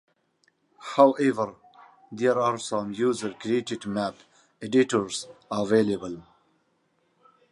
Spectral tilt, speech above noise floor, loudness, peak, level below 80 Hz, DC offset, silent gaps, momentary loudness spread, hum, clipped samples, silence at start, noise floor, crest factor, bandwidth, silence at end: -5 dB/octave; 45 dB; -25 LUFS; -4 dBFS; -68 dBFS; under 0.1%; none; 14 LU; none; under 0.1%; 0.8 s; -70 dBFS; 22 dB; 11.5 kHz; 1.3 s